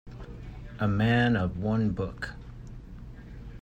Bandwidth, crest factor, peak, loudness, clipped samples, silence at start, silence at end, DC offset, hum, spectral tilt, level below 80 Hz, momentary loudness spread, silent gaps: 8.8 kHz; 16 dB; -12 dBFS; -28 LUFS; under 0.1%; 0.05 s; 0 s; under 0.1%; none; -8 dB/octave; -44 dBFS; 22 LU; none